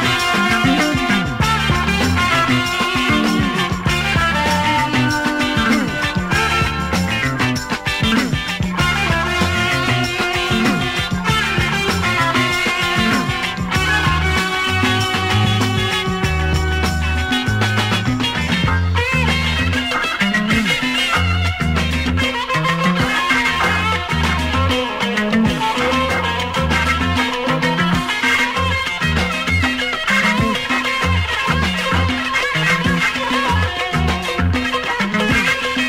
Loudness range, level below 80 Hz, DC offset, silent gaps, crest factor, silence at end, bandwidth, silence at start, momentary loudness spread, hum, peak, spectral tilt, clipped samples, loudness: 1 LU; -30 dBFS; under 0.1%; none; 14 dB; 0 s; 16 kHz; 0 s; 3 LU; none; -4 dBFS; -4.5 dB/octave; under 0.1%; -16 LUFS